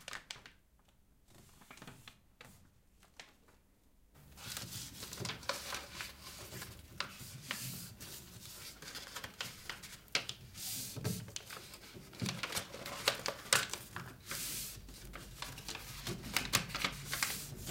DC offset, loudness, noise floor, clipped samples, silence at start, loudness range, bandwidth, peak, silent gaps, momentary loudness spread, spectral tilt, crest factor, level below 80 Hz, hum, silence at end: under 0.1%; -41 LUFS; -68 dBFS; under 0.1%; 0 s; 16 LU; 16.5 kHz; -8 dBFS; none; 19 LU; -2 dB/octave; 36 dB; -62 dBFS; none; 0 s